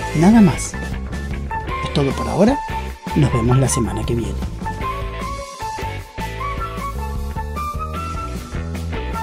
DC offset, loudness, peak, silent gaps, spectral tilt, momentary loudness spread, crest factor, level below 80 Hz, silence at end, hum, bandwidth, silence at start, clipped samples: under 0.1%; -21 LUFS; 0 dBFS; none; -6 dB/octave; 12 LU; 20 dB; -28 dBFS; 0 s; none; 16 kHz; 0 s; under 0.1%